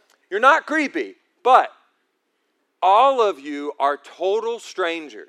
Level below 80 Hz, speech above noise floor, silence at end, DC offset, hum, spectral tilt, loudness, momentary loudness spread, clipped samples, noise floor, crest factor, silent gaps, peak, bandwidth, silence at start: -86 dBFS; 52 dB; 0.05 s; under 0.1%; none; -2 dB/octave; -19 LUFS; 14 LU; under 0.1%; -71 dBFS; 20 dB; none; 0 dBFS; 12 kHz; 0.3 s